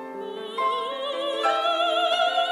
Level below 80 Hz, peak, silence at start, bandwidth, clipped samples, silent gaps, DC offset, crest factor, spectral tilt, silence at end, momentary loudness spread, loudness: under -90 dBFS; -10 dBFS; 0 s; 14 kHz; under 0.1%; none; under 0.1%; 16 dB; -1.5 dB/octave; 0 s; 10 LU; -24 LUFS